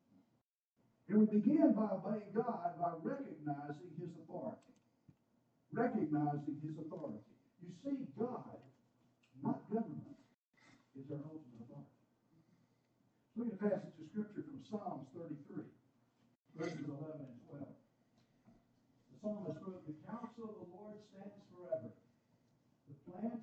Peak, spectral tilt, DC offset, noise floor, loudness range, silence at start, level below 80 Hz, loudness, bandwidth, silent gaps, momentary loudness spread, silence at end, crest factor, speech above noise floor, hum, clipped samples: -18 dBFS; -9.5 dB/octave; under 0.1%; -82 dBFS; 14 LU; 1.1 s; -88 dBFS; -41 LUFS; 7.2 kHz; 10.34-10.50 s; 20 LU; 0 s; 24 dB; 42 dB; none; under 0.1%